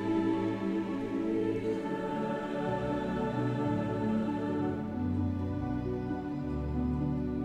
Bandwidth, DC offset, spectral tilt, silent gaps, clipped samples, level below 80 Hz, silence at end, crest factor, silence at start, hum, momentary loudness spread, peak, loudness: 10 kHz; under 0.1%; -8.5 dB/octave; none; under 0.1%; -48 dBFS; 0 s; 14 dB; 0 s; none; 3 LU; -18 dBFS; -33 LUFS